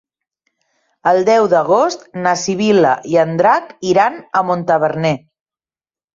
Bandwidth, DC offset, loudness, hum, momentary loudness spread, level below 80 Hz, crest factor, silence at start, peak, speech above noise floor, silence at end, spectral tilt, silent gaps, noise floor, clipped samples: 7.6 kHz; under 0.1%; -15 LUFS; none; 7 LU; -60 dBFS; 14 dB; 1.05 s; -2 dBFS; over 76 dB; 0.95 s; -5 dB/octave; none; under -90 dBFS; under 0.1%